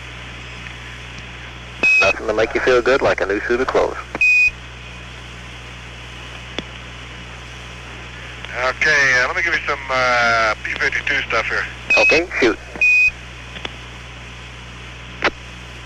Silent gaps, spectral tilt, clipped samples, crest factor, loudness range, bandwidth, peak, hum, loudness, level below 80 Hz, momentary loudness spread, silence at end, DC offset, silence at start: none; -3.5 dB/octave; under 0.1%; 16 dB; 13 LU; 13.5 kHz; -4 dBFS; none; -16 LUFS; -40 dBFS; 21 LU; 0 s; under 0.1%; 0 s